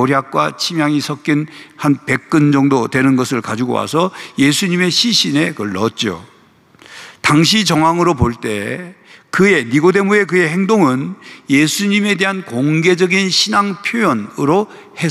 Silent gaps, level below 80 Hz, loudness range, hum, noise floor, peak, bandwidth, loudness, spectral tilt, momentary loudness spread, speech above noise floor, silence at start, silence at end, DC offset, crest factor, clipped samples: none; -46 dBFS; 2 LU; none; -48 dBFS; -2 dBFS; 14.5 kHz; -14 LUFS; -4.5 dB/octave; 9 LU; 34 dB; 0 s; 0 s; under 0.1%; 14 dB; under 0.1%